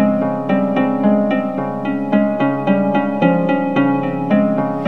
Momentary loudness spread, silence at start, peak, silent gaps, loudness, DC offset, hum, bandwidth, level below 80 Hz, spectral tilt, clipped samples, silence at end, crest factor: 4 LU; 0 s; 0 dBFS; none; -16 LUFS; 0.9%; none; 4.5 kHz; -60 dBFS; -9.5 dB/octave; under 0.1%; 0 s; 14 dB